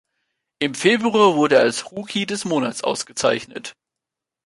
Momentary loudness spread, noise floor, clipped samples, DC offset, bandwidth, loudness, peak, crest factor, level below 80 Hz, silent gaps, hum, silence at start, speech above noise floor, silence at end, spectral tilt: 12 LU; -85 dBFS; under 0.1%; under 0.1%; 11.5 kHz; -19 LUFS; -2 dBFS; 18 dB; -64 dBFS; none; none; 0.6 s; 66 dB; 0.75 s; -3.5 dB/octave